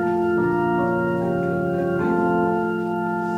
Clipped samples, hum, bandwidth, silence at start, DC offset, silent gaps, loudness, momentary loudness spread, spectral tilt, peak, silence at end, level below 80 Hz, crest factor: under 0.1%; none; 6.4 kHz; 0 s; under 0.1%; none; -22 LUFS; 4 LU; -9 dB/octave; -8 dBFS; 0 s; -52 dBFS; 14 dB